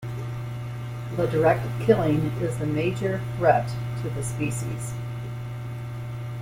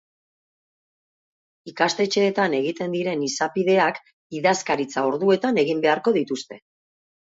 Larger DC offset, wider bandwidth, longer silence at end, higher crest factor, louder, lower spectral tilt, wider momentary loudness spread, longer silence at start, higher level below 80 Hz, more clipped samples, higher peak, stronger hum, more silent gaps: neither; first, 16 kHz vs 8 kHz; second, 0 s vs 0.7 s; about the same, 22 dB vs 18 dB; second, -26 LUFS vs -22 LUFS; first, -7 dB/octave vs -4.5 dB/octave; about the same, 12 LU vs 10 LU; second, 0 s vs 1.65 s; first, -48 dBFS vs -72 dBFS; neither; about the same, -4 dBFS vs -6 dBFS; neither; second, none vs 4.13-4.30 s